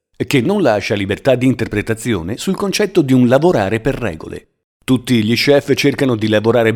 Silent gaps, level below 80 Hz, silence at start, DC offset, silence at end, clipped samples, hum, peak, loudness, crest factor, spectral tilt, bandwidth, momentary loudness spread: 4.64-4.80 s; -42 dBFS; 0.2 s; under 0.1%; 0 s; under 0.1%; none; 0 dBFS; -15 LUFS; 14 dB; -6 dB/octave; 17 kHz; 8 LU